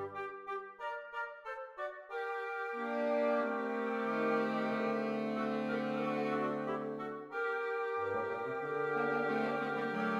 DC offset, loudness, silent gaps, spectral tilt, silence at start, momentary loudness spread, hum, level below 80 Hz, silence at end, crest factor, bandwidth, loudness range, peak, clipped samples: under 0.1%; -37 LUFS; none; -7 dB/octave; 0 s; 9 LU; none; -84 dBFS; 0 s; 14 dB; 10.5 kHz; 3 LU; -22 dBFS; under 0.1%